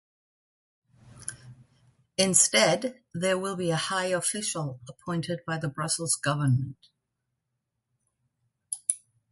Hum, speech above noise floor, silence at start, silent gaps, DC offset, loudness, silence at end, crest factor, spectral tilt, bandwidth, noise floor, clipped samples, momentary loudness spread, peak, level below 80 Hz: none; 55 dB; 1.05 s; none; under 0.1%; -27 LUFS; 0.35 s; 24 dB; -3 dB/octave; 12 kHz; -82 dBFS; under 0.1%; 18 LU; -8 dBFS; -66 dBFS